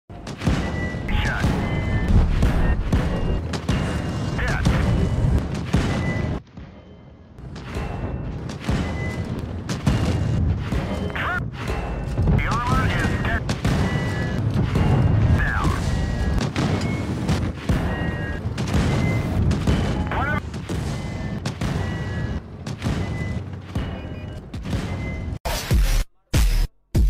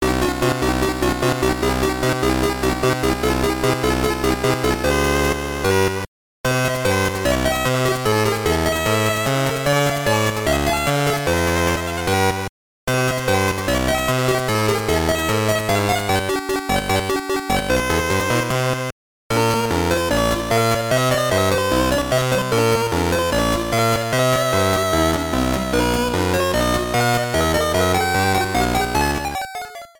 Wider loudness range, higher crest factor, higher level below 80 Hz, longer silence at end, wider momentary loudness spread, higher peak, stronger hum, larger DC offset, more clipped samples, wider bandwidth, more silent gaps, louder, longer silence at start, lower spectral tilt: first, 7 LU vs 1 LU; about the same, 16 dB vs 14 dB; about the same, -28 dBFS vs -32 dBFS; second, 0 s vs 0.15 s; first, 9 LU vs 3 LU; about the same, -6 dBFS vs -4 dBFS; neither; neither; neither; second, 16 kHz vs over 20 kHz; second, 25.40-25.44 s vs 6.08-6.44 s, 12.49-12.87 s, 18.92-19.30 s; second, -24 LUFS vs -19 LUFS; about the same, 0.1 s vs 0 s; first, -6.5 dB/octave vs -4.5 dB/octave